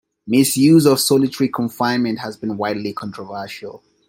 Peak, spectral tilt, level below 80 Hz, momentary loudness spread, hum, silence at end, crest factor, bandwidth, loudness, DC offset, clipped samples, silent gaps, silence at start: -2 dBFS; -5 dB/octave; -60 dBFS; 17 LU; none; 0.3 s; 16 dB; 16.5 kHz; -17 LUFS; under 0.1%; under 0.1%; none; 0.25 s